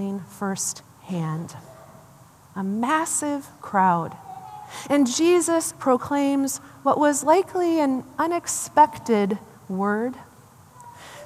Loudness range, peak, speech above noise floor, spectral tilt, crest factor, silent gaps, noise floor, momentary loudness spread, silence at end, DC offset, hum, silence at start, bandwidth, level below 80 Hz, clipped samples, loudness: 6 LU; -4 dBFS; 28 dB; -4.5 dB/octave; 20 dB; none; -50 dBFS; 19 LU; 0 s; under 0.1%; none; 0 s; 15 kHz; -68 dBFS; under 0.1%; -23 LUFS